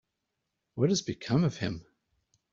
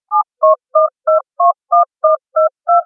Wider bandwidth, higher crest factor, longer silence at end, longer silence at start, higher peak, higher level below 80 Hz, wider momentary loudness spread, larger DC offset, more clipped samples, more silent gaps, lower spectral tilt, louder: first, 7.8 kHz vs 1.6 kHz; first, 20 dB vs 12 dB; first, 0.7 s vs 0 s; first, 0.75 s vs 0.1 s; second, -12 dBFS vs -2 dBFS; first, -62 dBFS vs under -90 dBFS; first, 14 LU vs 4 LU; neither; neither; neither; about the same, -5.5 dB/octave vs -6 dB/octave; second, -30 LUFS vs -14 LUFS